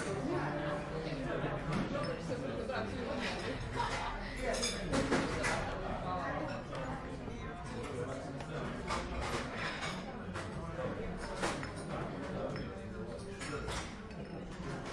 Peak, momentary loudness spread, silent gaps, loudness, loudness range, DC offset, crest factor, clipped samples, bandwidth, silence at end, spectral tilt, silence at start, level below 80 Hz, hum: -18 dBFS; 8 LU; none; -39 LUFS; 5 LU; under 0.1%; 20 dB; under 0.1%; 12 kHz; 0 s; -5 dB/octave; 0 s; -50 dBFS; none